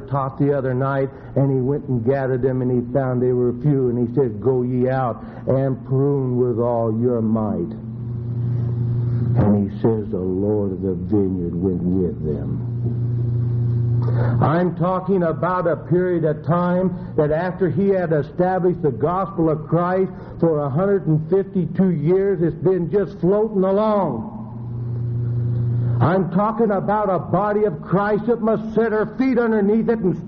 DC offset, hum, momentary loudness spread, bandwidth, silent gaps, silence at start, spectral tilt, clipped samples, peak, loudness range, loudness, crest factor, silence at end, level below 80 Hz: under 0.1%; none; 6 LU; 4.8 kHz; none; 0 s; -9.5 dB/octave; under 0.1%; -2 dBFS; 2 LU; -20 LUFS; 16 dB; 0 s; -44 dBFS